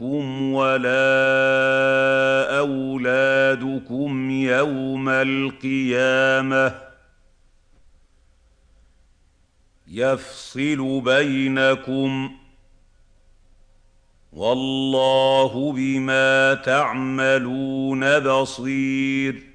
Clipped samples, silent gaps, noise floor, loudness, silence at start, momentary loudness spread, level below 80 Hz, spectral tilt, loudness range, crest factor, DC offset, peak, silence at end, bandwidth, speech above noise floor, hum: under 0.1%; none; -59 dBFS; -20 LUFS; 0 s; 8 LU; -56 dBFS; -5 dB/octave; 9 LU; 16 dB; under 0.1%; -4 dBFS; 0.15 s; 9.8 kHz; 39 dB; none